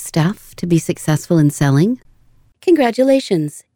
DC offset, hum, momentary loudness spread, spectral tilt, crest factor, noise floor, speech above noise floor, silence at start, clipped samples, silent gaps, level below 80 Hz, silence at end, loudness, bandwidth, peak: under 0.1%; none; 7 LU; -6.5 dB/octave; 12 dB; -51 dBFS; 36 dB; 0 s; under 0.1%; none; -50 dBFS; 0.15 s; -16 LUFS; 19.5 kHz; -4 dBFS